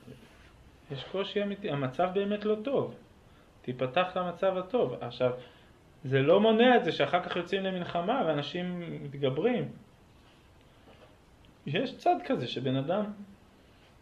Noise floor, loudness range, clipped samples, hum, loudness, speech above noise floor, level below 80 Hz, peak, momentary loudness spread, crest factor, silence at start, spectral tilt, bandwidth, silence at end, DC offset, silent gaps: -58 dBFS; 7 LU; under 0.1%; none; -30 LUFS; 29 dB; -64 dBFS; -10 dBFS; 16 LU; 20 dB; 0.05 s; -7 dB/octave; 8.4 kHz; 0.65 s; under 0.1%; none